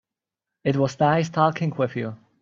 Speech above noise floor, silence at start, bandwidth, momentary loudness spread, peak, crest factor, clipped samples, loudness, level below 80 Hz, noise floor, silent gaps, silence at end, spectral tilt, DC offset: 65 dB; 0.65 s; 7.6 kHz; 9 LU; -4 dBFS; 20 dB; under 0.1%; -23 LUFS; -62 dBFS; -87 dBFS; none; 0.25 s; -7 dB/octave; under 0.1%